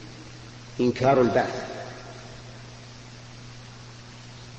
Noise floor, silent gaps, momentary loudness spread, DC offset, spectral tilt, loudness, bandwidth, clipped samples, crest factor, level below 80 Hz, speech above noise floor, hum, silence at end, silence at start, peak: -44 dBFS; none; 23 LU; under 0.1%; -6 dB/octave; -24 LUFS; 8.6 kHz; under 0.1%; 20 dB; -54 dBFS; 21 dB; none; 0 s; 0 s; -8 dBFS